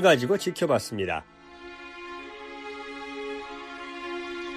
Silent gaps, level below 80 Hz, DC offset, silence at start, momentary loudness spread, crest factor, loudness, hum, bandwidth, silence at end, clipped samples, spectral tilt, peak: none; -60 dBFS; under 0.1%; 0 s; 16 LU; 24 dB; -30 LUFS; none; 15 kHz; 0 s; under 0.1%; -4.5 dB/octave; -6 dBFS